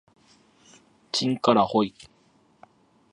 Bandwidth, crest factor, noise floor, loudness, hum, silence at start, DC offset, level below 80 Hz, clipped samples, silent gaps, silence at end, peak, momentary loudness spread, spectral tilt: 11 kHz; 22 dB; -62 dBFS; -24 LUFS; none; 1.15 s; under 0.1%; -66 dBFS; under 0.1%; none; 1.25 s; -6 dBFS; 9 LU; -5 dB/octave